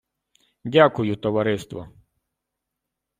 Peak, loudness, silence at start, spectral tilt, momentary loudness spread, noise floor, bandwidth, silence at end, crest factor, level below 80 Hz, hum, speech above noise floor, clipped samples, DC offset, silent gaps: -2 dBFS; -21 LUFS; 0.65 s; -6.5 dB/octave; 20 LU; -83 dBFS; 15.5 kHz; 1.3 s; 22 dB; -60 dBFS; none; 62 dB; under 0.1%; under 0.1%; none